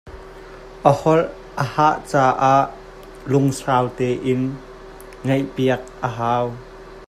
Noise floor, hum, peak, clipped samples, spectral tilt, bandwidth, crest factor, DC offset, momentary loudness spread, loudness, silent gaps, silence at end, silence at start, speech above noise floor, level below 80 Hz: -39 dBFS; none; 0 dBFS; under 0.1%; -6.5 dB/octave; 14.5 kHz; 20 dB; under 0.1%; 23 LU; -20 LUFS; none; 0.05 s; 0.05 s; 20 dB; -46 dBFS